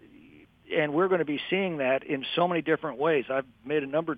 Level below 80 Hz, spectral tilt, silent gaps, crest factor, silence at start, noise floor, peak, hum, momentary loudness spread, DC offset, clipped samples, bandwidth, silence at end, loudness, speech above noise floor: -68 dBFS; -8.5 dB/octave; none; 16 dB; 0.7 s; -55 dBFS; -12 dBFS; none; 6 LU; under 0.1%; under 0.1%; 5 kHz; 0 s; -28 LUFS; 27 dB